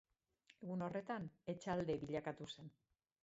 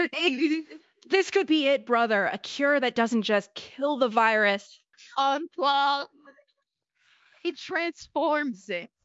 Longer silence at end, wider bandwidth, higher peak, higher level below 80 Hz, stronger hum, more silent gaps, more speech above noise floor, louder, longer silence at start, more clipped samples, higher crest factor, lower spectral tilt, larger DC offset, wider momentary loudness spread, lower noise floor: first, 0.55 s vs 0.2 s; about the same, 7.6 kHz vs 8 kHz; second, -30 dBFS vs -8 dBFS; about the same, -74 dBFS vs -76 dBFS; neither; neither; second, 30 dB vs 53 dB; second, -46 LUFS vs -26 LUFS; first, 0.6 s vs 0 s; neither; about the same, 18 dB vs 18 dB; first, -5.5 dB/octave vs -4 dB/octave; neither; about the same, 13 LU vs 11 LU; about the same, -75 dBFS vs -78 dBFS